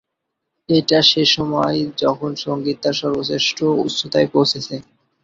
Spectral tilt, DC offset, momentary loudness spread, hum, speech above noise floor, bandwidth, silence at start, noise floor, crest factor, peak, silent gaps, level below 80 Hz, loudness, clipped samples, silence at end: -4.5 dB/octave; under 0.1%; 11 LU; none; 60 dB; 7.8 kHz; 0.7 s; -78 dBFS; 18 dB; 0 dBFS; none; -56 dBFS; -17 LUFS; under 0.1%; 0.45 s